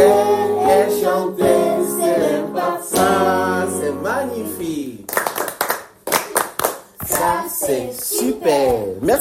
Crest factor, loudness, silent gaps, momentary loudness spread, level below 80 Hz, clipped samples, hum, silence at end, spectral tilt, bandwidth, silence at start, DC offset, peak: 18 dB; -18 LUFS; none; 8 LU; -50 dBFS; under 0.1%; none; 0 s; -3.5 dB/octave; 16.5 kHz; 0 s; under 0.1%; 0 dBFS